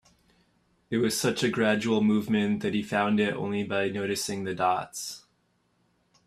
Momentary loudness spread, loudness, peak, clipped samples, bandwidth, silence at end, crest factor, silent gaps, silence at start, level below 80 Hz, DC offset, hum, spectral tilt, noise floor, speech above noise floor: 8 LU; -27 LUFS; -10 dBFS; under 0.1%; 14.5 kHz; 1.1 s; 18 dB; none; 0.9 s; -66 dBFS; under 0.1%; none; -4.5 dB/octave; -71 dBFS; 44 dB